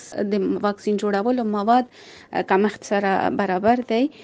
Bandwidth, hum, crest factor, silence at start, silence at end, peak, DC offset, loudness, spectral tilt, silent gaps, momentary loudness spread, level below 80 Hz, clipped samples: 9.2 kHz; none; 16 dB; 0 s; 0 s; -4 dBFS; under 0.1%; -21 LUFS; -6 dB/octave; none; 5 LU; -62 dBFS; under 0.1%